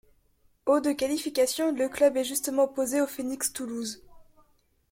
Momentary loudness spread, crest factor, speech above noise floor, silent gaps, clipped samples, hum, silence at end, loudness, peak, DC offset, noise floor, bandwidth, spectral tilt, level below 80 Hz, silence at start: 9 LU; 18 dB; 39 dB; none; under 0.1%; none; 0.7 s; -27 LUFS; -10 dBFS; under 0.1%; -65 dBFS; 16.5 kHz; -2 dB/octave; -64 dBFS; 0.65 s